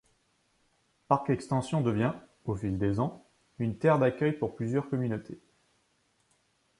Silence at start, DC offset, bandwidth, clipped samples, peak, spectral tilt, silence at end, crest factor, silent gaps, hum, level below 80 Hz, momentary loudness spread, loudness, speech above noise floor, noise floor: 1.1 s; under 0.1%; 11.5 kHz; under 0.1%; -8 dBFS; -8 dB/octave; 1.45 s; 24 dB; none; none; -56 dBFS; 11 LU; -30 LUFS; 43 dB; -72 dBFS